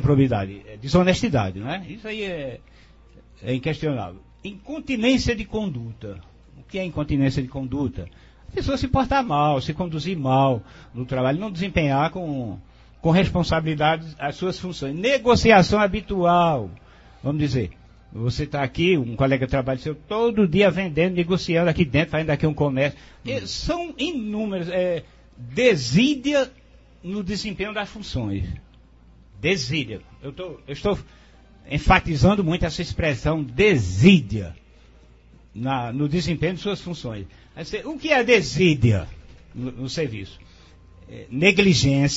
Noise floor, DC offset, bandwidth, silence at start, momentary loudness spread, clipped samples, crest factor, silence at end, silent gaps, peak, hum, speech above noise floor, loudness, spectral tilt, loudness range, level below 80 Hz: -50 dBFS; under 0.1%; 8 kHz; 0 s; 16 LU; under 0.1%; 22 dB; 0 s; none; -2 dBFS; none; 29 dB; -22 LUFS; -6 dB/octave; 8 LU; -40 dBFS